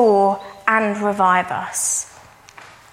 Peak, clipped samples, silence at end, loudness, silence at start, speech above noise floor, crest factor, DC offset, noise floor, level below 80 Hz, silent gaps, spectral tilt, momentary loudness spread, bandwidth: 0 dBFS; under 0.1%; 0.25 s; -18 LUFS; 0 s; 26 dB; 18 dB; under 0.1%; -45 dBFS; -62 dBFS; none; -3.5 dB/octave; 7 LU; 16 kHz